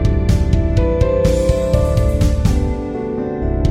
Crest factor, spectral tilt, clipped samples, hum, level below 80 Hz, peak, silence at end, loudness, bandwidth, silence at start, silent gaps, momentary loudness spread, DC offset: 14 dB; -7.5 dB/octave; under 0.1%; none; -18 dBFS; -2 dBFS; 0 s; -17 LUFS; 14 kHz; 0 s; none; 7 LU; under 0.1%